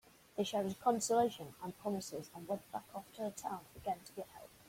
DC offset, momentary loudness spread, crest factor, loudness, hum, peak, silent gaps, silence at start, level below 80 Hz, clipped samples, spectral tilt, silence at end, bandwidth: under 0.1%; 15 LU; 20 dB; -40 LUFS; none; -20 dBFS; none; 0.35 s; -74 dBFS; under 0.1%; -4.5 dB/octave; 0 s; 16.5 kHz